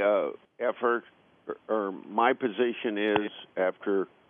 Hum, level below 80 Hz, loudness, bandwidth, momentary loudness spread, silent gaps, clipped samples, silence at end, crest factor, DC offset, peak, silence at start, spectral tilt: none; -78 dBFS; -29 LUFS; 3.7 kHz; 10 LU; none; under 0.1%; 0.25 s; 22 dB; under 0.1%; -8 dBFS; 0 s; -3 dB/octave